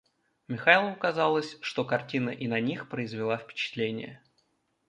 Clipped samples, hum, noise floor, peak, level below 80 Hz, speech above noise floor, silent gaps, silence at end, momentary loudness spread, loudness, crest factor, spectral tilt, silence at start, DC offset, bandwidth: under 0.1%; none; -73 dBFS; -4 dBFS; -74 dBFS; 44 dB; none; 0.7 s; 13 LU; -28 LUFS; 26 dB; -5.5 dB/octave; 0.5 s; under 0.1%; 10 kHz